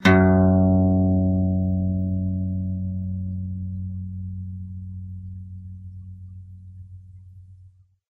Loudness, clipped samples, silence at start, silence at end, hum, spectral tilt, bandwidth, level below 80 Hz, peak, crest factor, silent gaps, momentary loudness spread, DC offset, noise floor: -22 LUFS; under 0.1%; 0 s; 0.45 s; none; -8.5 dB/octave; 6.8 kHz; -44 dBFS; -4 dBFS; 18 dB; none; 24 LU; under 0.1%; -52 dBFS